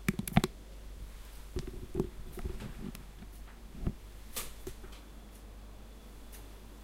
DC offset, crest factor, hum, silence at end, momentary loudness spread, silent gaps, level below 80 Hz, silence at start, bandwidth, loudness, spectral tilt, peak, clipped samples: under 0.1%; 30 dB; none; 0 s; 19 LU; none; -46 dBFS; 0 s; 16.5 kHz; -41 LUFS; -5.5 dB/octave; -8 dBFS; under 0.1%